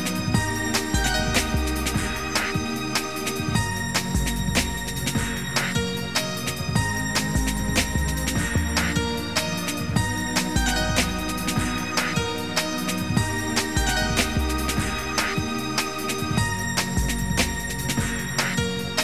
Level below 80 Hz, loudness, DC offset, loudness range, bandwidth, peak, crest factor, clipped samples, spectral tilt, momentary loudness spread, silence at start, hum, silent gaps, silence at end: -32 dBFS; -24 LUFS; 0.8%; 1 LU; 16 kHz; -6 dBFS; 18 dB; under 0.1%; -3.5 dB/octave; 3 LU; 0 s; none; none; 0 s